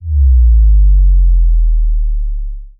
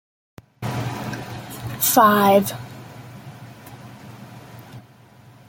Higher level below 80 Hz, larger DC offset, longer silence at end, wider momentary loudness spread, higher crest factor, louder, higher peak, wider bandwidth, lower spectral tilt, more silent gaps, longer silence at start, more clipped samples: first, -8 dBFS vs -56 dBFS; neither; second, 0.1 s vs 0.7 s; second, 11 LU vs 27 LU; second, 6 dB vs 22 dB; first, -13 LUFS vs -19 LUFS; about the same, -2 dBFS vs -2 dBFS; second, 0.2 kHz vs 17 kHz; first, -18 dB/octave vs -4.5 dB/octave; neither; second, 0 s vs 0.6 s; neither